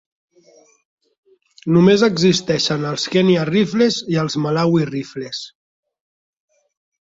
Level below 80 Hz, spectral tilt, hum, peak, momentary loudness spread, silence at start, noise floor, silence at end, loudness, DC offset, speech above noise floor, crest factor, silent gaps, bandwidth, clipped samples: -56 dBFS; -5.5 dB/octave; none; -2 dBFS; 14 LU; 1.65 s; -52 dBFS; 1.7 s; -17 LUFS; under 0.1%; 35 dB; 16 dB; none; 7.8 kHz; under 0.1%